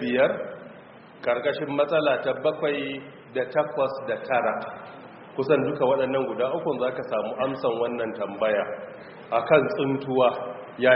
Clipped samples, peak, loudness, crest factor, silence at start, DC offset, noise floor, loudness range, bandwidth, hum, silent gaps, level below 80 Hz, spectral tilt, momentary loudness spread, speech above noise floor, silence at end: under 0.1%; -4 dBFS; -25 LUFS; 20 dB; 0 s; under 0.1%; -47 dBFS; 2 LU; 5.4 kHz; none; none; -68 dBFS; -3.5 dB/octave; 15 LU; 22 dB; 0 s